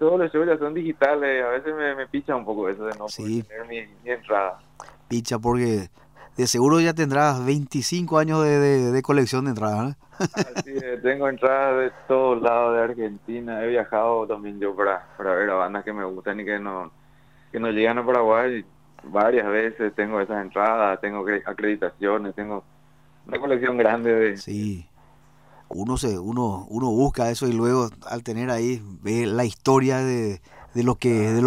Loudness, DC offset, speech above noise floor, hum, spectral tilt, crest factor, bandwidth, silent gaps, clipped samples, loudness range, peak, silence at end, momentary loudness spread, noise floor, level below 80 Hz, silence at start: -23 LUFS; 0.1%; 34 dB; none; -5.5 dB/octave; 18 dB; 16 kHz; none; under 0.1%; 5 LU; -6 dBFS; 0 s; 11 LU; -56 dBFS; -50 dBFS; 0 s